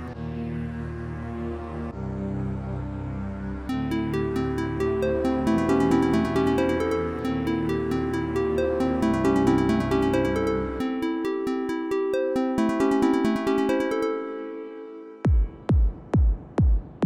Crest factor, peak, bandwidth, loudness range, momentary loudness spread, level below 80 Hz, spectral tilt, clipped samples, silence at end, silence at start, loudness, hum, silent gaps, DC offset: 14 dB; -10 dBFS; 16 kHz; 6 LU; 11 LU; -32 dBFS; -7.5 dB/octave; under 0.1%; 0 s; 0 s; -25 LUFS; none; none; under 0.1%